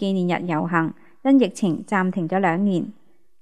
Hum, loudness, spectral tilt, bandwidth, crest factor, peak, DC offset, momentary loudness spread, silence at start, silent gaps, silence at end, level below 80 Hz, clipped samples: none; -22 LUFS; -7 dB/octave; 11 kHz; 18 dB; -4 dBFS; 0.4%; 9 LU; 0 s; none; 0.5 s; -72 dBFS; under 0.1%